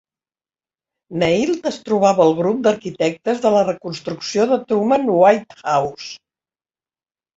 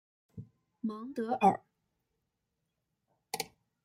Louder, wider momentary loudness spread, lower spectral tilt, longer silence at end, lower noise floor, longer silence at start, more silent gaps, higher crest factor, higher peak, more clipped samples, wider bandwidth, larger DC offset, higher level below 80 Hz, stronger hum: first, -18 LUFS vs -34 LUFS; second, 13 LU vs 24 LU; about the same, -5.5 dB/octave vs -5 dB/octave; first, 1.2 s vs 0.4 s; first, under -90 dBFS vs -84 dBFS; first, 1.1 s vs 0.35 s; neither; second, 18 dB vs 26 dB; first, -2 dBFS vs -12 dBFS; neither; second, 8 kHz vs 16 kHz; neither; first, -58 dBFS vs -76 dBFS; neither